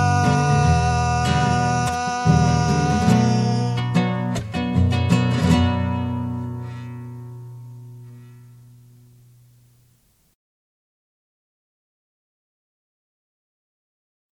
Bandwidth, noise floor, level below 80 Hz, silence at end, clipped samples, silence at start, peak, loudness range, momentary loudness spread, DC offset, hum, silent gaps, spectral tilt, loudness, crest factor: 12 kHz; -60 dBFS; -42 dBFS; 5.95 s; under 0.1%; 0 s; -4 dBFS; 18 LU; 19 LU; under 0.1%; none; none; -6 dB/octave; -20 LUFS; 18 dB